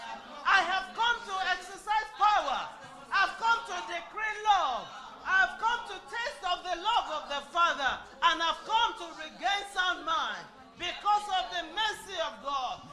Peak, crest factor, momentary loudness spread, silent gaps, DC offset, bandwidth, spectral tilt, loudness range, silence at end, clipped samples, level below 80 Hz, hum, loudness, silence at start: -10 dBFS; 22 dB; 11 LU; none; under 0.1%; 13.5 kHz; -0.5 dB/octave; 2 LU; 0 s; under 0.1%; -60 dBFS; none; -30 LUFS; 0 s